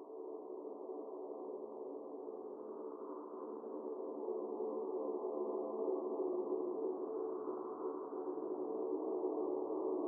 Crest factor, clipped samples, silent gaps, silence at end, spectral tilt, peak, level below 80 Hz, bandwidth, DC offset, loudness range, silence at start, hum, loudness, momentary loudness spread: 14 dB; under 0.1%; none; 0 s; 4.5 dB/octave; -28 dBFS; under -90 dBFS; 1.7 kHz; under 0.1%; 7 LU; 0 s; none; -43 LUFS; 8 LU